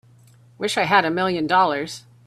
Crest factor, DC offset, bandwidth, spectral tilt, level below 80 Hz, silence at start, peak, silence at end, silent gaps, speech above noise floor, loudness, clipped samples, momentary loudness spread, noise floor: 20 dB; under 0.1%; 14 kHz; -4 dB/octave; -62 dBFS; 0.6 s; -2 dBFS; 0.25 s; none; 31 dB; -20 LUFS; under 0.1%; 11 LU; -51 dBFS